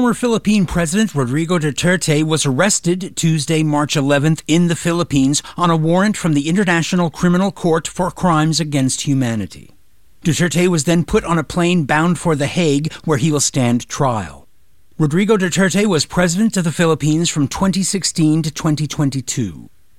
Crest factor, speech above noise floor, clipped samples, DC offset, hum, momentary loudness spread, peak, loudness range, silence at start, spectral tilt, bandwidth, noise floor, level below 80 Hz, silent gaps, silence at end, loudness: 14 dB; 42 dB; under 0.1%; 1%; none; 4 LU; -2 dBFS; 2 LU; 0 s; -5 dB/octave; 15.5 kHz; -57 dBFS; -42 dBFS; none; 0.35 s; -16 LUFS